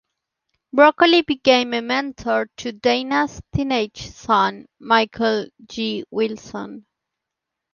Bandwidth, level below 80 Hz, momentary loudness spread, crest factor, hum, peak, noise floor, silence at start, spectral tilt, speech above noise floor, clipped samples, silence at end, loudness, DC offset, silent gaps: 7.2 kHz; -50 dBFS; 16 LU; 18 dB; none; -2 dBFS; -83 dBFS; 0.75 s; -4.5 dB/octave; 63 dB; under 0.1%; 0.95 s; -19 LUFS; under 0.1%; none